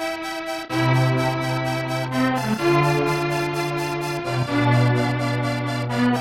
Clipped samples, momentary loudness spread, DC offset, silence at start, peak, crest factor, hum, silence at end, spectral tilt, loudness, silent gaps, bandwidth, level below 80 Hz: under 0.1%; 7 LU; under 0.1%; 0 s; -6 dBFS; 14 dB; none; 0 s; -6 dB/octave; -22 LUFS; none; 16.5 kHz; -50 dBFS